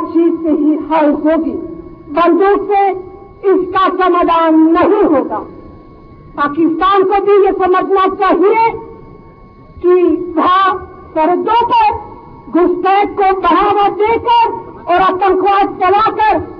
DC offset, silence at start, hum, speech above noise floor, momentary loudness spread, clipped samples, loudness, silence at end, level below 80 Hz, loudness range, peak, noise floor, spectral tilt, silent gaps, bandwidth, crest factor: under 0.1%; 0 s; none; 27 dB; 10 LU; under 0.1%; -12 LUFS; 0 s; -42 dBFS; 2 LU; 0 dBFS; -38 dBFS; -8 dB/octave; none; 5.4 kHz; 12 dB